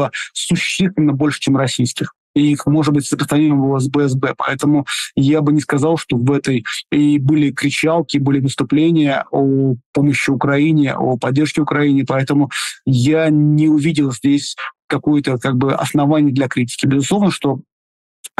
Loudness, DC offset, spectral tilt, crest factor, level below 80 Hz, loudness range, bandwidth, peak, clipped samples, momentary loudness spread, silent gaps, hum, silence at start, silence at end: -16 LUFS; under 0.1%; -6 dB/octave; 10 dB; -54 dBFS; 1 LU; 12.5 kHz; -6 dBFS; under 0.1%; 5 LU; 2.18-2.34 s, 9.86-9.93 s, 14.84-14.88 s, 17.72-18.24 s; none; 0 s; 0.1 s